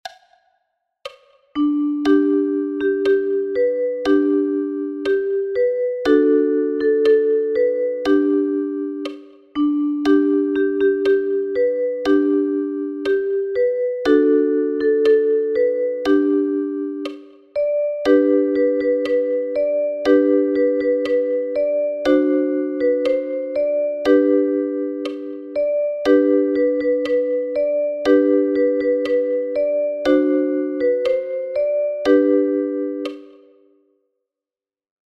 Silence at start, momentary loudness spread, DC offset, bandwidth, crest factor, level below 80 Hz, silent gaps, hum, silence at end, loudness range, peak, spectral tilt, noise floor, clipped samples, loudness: 0.05 s; 9 LU; under 0.1%; 6.4 kHz; 16 dB; -58 dBFS; none; none; 1.8 s; 2 LU; -2 dBFS; -5.5 dB/octave; under -90 dBFS; under 0.1%; -19 LUFS